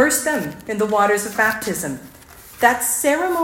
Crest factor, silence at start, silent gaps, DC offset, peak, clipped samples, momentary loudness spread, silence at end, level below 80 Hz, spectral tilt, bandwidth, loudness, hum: 18 dB; 0 s; none; under 0.1%; 0 dBFS; under 0.1%; 9 LU; 0 s; -54 dBFS; -3 dB/octave; 17 kHz; -19 LUFS; none